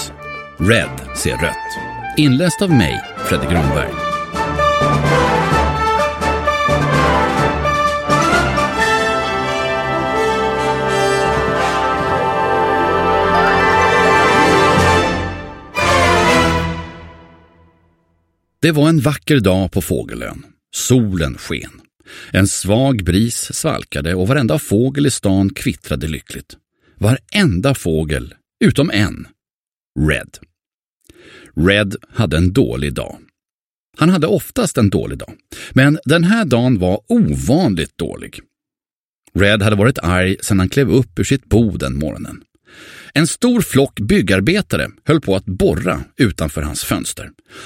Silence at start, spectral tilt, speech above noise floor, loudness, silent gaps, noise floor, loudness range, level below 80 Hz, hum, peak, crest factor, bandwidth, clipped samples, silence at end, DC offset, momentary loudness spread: 0 s; -5 dB/octave; over 75 dB; -15 LUFS; 29.54-29.92 s, 30.74-30.98 s, 33.52-33.93 s, 38.93-39.22 s; under -90 dBFS; 5 LU; -32 dBFS; none; 0 dBFS; 16 dB; 16.5 kHz; under 0.1%; 0 s; under 0.1%; 12 LU